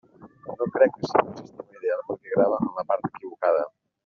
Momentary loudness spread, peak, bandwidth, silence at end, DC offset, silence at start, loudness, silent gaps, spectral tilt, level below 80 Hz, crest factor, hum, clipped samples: 17 LU; -4 dBFS; 6.8 kHz; 0.35 s; under 0.1%; 0.2 s; -25 LUFS; none; -5.5 dB/octave; -66 dBFS; 22 dB; none; under 0.1%